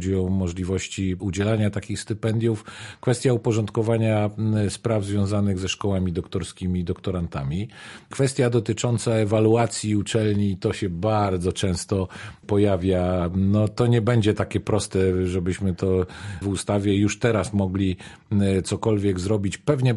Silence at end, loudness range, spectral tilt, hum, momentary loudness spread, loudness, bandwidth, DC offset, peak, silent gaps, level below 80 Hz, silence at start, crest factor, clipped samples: 0 s; 3 LU; -6.5 dB/octave; none; 7 LU; -23 LUFS; 11.5 kHz; under 0.1%; -6 dBFS; none; -40 dBFS; 0 s; 16 dB; under 0.1%